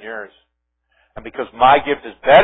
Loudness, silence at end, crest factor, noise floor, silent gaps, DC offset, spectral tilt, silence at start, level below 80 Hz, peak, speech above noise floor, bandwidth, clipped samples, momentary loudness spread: -15 LUFS; 0 s; 16 dB; -70 dBFS; none; under 0.1%; -7 dB/octave; 0.05 s; -50 dBFS; 0 dBFS; 56 dB; 3.9 kHz; under 0.1%; 22 LU